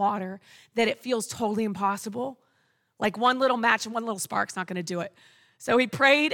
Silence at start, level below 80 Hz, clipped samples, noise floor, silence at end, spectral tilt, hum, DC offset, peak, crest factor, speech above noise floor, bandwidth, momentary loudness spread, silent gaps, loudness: 0 s; -72 dBFS; under 0.1%; -70 dBFS; 0 s; -3.5 dB/octave; none; under 0.1%; -8 dBFS; 20 dB; 44 dB; 19 kHz; 13 LU; none; -26 LUFS